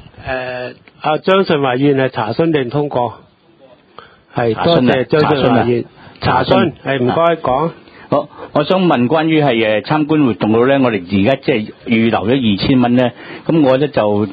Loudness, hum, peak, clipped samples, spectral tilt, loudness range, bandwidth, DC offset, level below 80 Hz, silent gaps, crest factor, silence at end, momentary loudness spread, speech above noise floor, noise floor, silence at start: -14 LUFS; none; 0 dBFS; under 0.1%; -9 dB/octave; 3 LU; 5 kHz; under 0.1%; -44 dBFS; none; 14 dB; 0 s; 9 LU; 32 dB; -46 dBFS; 0.2 s